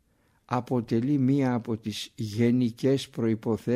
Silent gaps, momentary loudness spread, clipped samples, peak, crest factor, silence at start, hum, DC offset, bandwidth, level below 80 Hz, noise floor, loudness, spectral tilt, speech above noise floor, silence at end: none; 8 LU; under 0.1%; -12 dBFS; 16 dB; 0.5 s; none; under 0.1%; 14.5 kHz; -64 dBFS; -62 dBFS; -27 LUFS; -7 dB/octave; 36 dB; 0 s